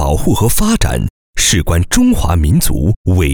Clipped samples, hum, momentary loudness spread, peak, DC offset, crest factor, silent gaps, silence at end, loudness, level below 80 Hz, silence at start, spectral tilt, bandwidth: under 0.1%; none; 4 LU; 0 dBFS; under 0.1%; 12 dB; 1.10-1.34 s, 2.96-3.05 s; 0 s; -13 LUFS; -20 dBFS; 0 s; -4.5 dB/octave; over 20 kHz